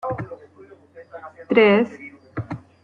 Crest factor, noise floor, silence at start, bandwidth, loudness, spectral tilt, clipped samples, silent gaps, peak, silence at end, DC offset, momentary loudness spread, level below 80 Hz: 20 dB; -48 dBFS; 0.05 s; 6.4 kHz; -19 LUFS; -8 dB/octave; under 0.1%; none; -4 dBFS; 0.25 s; under 0.1%; 25 LU; -58 dBFS